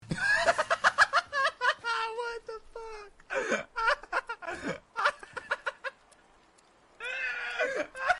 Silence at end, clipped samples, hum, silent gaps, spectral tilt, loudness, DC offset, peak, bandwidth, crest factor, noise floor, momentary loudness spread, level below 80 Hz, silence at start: 0 s; under 0.1%; none; none; -2.5 dB/octave; -30 LUFS; under 0.1%; -12 dBFS; 11.5 kHz; 18 dB; -62 dBFS; 17 LU; -60 dBFS; 0 s